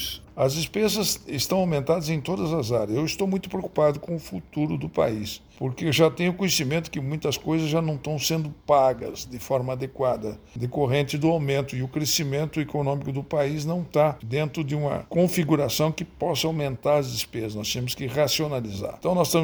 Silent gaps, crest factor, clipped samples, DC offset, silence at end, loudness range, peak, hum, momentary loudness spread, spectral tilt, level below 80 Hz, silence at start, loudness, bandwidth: none; 18 dB; under 0.1%; under 0.1%; 0 s; 1 LU; -6 dBFS; none; 8 LU; -5 dB/octave; -52 dBFS; 0 s; -25 LUFS; over 20 kHz